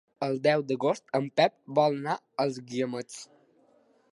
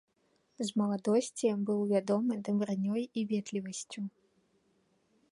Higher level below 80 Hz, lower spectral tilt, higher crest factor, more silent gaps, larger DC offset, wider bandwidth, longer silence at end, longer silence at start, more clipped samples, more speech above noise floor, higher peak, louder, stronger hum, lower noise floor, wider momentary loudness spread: about the same, -80 dBFS vs -78 dBFS; about the same, -5.5 dB/octave vs -6 dB/octave; about the same, 20 dB vs 18 dB; neither; neither; about the same, 11.5 kHz vs 11.5 kHz; second, 0.9 s vs 1.2 s; second, 0.2 s vs 0.6 s; neither; second, 36 dB vs 42 dB; first, -8 dBFS vs -16 dBFS; first, -28 LUFS vs -33 LUFS; neither; second, -64 dBFS vs -74 dBFS; about the same, 8 LU vs 10 LU